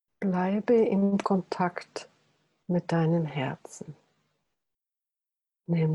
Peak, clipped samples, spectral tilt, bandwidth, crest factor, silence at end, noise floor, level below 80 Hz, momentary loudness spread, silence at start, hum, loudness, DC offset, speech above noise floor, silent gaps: -12 dBFS; under 0.1%; -8 dB/octave; 11 kHz; 16 dB; 0 s; -89 dBFS; -70 dBFS; 19 LU; 0.2 s; none; -27 LUFS; under 0.1%; 63 dB; none